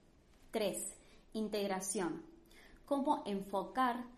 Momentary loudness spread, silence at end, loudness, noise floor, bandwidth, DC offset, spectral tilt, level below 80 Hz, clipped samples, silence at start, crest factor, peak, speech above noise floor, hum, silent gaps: 11 LU; 0 s; -39 LUFS; -64 dBFS; 13 kHz; under 0.1%; -4 dB/octave; -66 dBFS; under 0.1%; 0.45 s; 18 dB; -20 dBFS; 26 dB; none; none